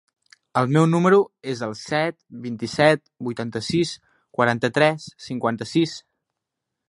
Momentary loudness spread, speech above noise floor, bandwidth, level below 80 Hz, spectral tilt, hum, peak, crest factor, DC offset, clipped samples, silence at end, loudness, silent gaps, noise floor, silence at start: 15 LU; 61 dB; 11.5 kHz; -62 dBFS; -6 dB/octave; none; -2 dBFS; 22 dB; under 0.1%; under 0.1%; 0.9 s; -22 LUFS; none; -83 dBFS; 0.55 s